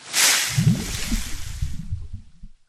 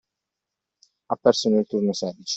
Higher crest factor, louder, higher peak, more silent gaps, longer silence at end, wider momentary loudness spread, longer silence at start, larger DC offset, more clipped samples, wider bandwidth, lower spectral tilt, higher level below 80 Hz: about the same, 20 dB vs 22 dB; about the same, -21 LUFS vs -22 LUFS; about the same, -2 dBFS vs -4 dBFS; neither; first, 0.15 s vs 0 s; first, 18 LU vs 9 LU; second, 0 s vs 1.1 s; neither; neither; first, 14.5 kHz vs 8.2 kHz; second, -2.5 dB/octave vs -5 dB/octave; first, -34 dBFS vs -68 dBFS